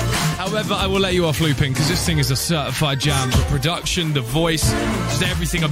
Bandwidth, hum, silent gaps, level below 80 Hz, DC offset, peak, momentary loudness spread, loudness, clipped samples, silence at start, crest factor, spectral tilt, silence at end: 16 kHz; none; none; -30 dBFS; under 0.1%; -6 dBFS; 3 LU; -19 LUFS; under 0.1%; 0 s; 14 dB; -4.5 dB/octave; 0 s